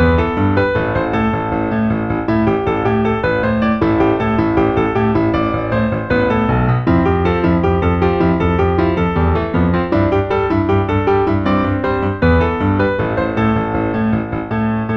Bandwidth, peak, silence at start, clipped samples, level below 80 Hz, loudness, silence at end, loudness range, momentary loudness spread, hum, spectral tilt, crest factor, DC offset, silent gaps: 6.2 kHz; -2 dBFS; 0 s; under 0.1%; -28 dBFS; -16 LUFS; 0 s; 1 LU; 3 LU; none; -9.5 dB/octave; 14 dB; under 0.1%; none